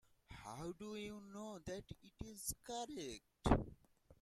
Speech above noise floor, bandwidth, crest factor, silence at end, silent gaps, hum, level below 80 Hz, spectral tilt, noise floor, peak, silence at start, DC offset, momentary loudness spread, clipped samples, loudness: 21 dB; 16 kHz; 28 dB; 0.05 s; none; none; -54 dBFS; -5 dB/octave; -66 dBFS; -18 dBFS; 0.3 s; under 0.1%; 17 LU; under 0.1%; -46 LUFS